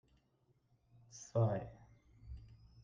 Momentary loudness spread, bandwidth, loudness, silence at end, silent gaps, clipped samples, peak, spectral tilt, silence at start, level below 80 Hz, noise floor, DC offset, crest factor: 22 LU; 7.6 kHz; -38 LUFS; 0.3 s; none; under 0.1%; -22 dBFS; -7.5 dB/octave; 1.15 s; -62 dBFS; -76 dBFS; under 0.1%; 22 dB